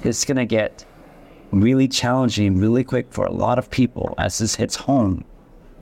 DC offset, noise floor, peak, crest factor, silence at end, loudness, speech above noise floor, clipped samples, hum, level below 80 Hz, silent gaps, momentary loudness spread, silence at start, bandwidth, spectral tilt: under 0.1%; -45 dBFS; -8 dBFS; 12 dB; 0 s; -20 LUFS; 26 dB; under 0.1%; none; -44 dBFS; none; 6 LU; 0 s; 16 kHz; -5 dB/octave